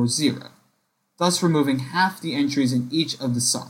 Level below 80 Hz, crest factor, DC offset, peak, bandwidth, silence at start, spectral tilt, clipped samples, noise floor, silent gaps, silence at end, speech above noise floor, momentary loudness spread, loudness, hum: -66 dBFS; 16 dB; under 0.1%; -8 dBFS; 16.5 kHz; 0 s; -4 dB/octave; under 0.1%; -70 dBFS; none; 0 s; 48 dB; 4 LU; -22 LUFS; none